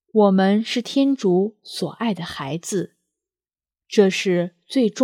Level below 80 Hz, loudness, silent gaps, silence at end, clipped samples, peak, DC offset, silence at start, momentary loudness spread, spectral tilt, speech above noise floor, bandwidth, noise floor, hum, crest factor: -66 dBFS; -21 LUFS; none; 0 s; under 0.1%; -2 dBFS; under 0.1%; 0.15 s; 11 LU; -5.5 dB/octave; over 70 dB; 14.5 kHz; under -90 dBFS; none; 18 dB